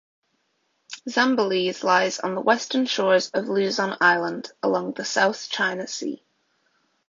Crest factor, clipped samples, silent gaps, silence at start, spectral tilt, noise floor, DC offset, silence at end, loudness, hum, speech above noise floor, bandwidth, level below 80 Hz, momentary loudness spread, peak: 20 dB; under 0.1%; none; 0.9 s; -3.5 dB/octave; -71 dBFS; under 0.1%; 0.95 s; -23 LUFS; none; 48 dB; 7.6 kHz; -74 dBFS; 10 LU; -4 dBFS